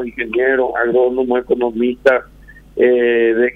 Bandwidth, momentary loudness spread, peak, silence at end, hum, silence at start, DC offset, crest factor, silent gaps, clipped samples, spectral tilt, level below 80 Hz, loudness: 5.4 kHz; 5 LU; 0 dBFS; 0.05 s; none; 0 s; under 0.1%; 14 dB; none; under 0.1%; -6.5 dB/octave; -46 dBFS; -15 LUFS